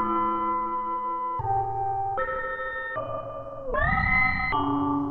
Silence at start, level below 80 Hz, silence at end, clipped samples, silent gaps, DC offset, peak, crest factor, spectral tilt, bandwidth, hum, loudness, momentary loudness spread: 0 s; -40 dBFS; 0 s; under 0.1%; none; under 0.1%; -12 dBFS; 16 dB; -8.5 dB/octave; 4.6 kHz; none; -27 LUFS; 10 LU